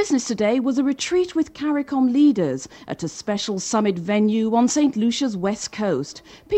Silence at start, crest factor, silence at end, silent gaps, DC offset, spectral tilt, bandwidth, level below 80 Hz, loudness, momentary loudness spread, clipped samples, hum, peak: 0 s; 12 dB; 0 s; none; under 0.1%; -4.5 dB/octave; 8.8 kHz; -58 dBFS; -21 LUFS; 10 LU; under 0.1%; none; -8 dBFS